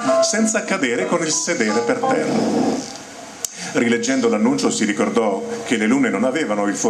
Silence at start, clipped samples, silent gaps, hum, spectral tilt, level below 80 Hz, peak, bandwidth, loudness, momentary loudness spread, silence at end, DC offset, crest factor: 0 s; under 0.1%; none; none; -3.5 dB/octave; -60 dBFS; -2 dBFS; 14 kHz; -19 LUFS; 9 LU; 0 s; under 0.1%; 16 dB